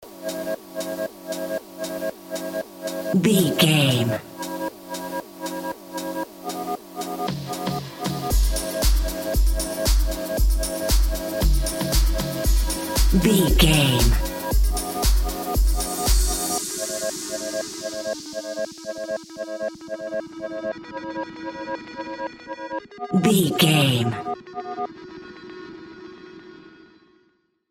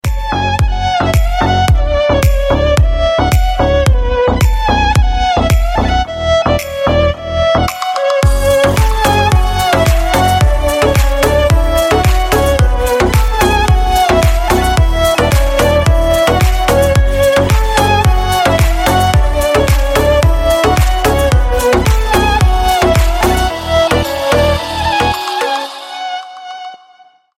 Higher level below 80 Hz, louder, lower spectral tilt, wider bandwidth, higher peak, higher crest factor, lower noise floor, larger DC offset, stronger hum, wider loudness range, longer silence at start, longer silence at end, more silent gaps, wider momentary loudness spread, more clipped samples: second, -26 dBFS vs -16 dBFS; second, -24 LUFS vs -12 LUFS; about the same, -4.5 dB/octave vs -5 dB/octave; about the same, 17 kHz vs 16.5 kHz; about the same, -2 dBFS vs 0 dBFS; first, 20 dB vs 10 dB; first, -65 dBFS vs -45 dBFS; neither; neither; first, 11 LU vs 2 LU; about the same, 0 s vs 0.05 s; first, 1 s vs 0.6 s; neither; first, 15 LU vs 4 LU; neither